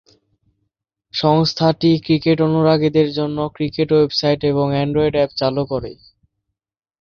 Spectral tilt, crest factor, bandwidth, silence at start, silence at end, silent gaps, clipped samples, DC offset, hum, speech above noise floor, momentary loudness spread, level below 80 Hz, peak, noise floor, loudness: -7 dB/octave; 16 dB; 6.8 kHz; 1.15 s; 1.05 s; none; under 0.1%; under 0.1%; none; 64 dB; 7 LU; -48 dBFS; -2 dBFS; -80 dBFS; -17 LUFS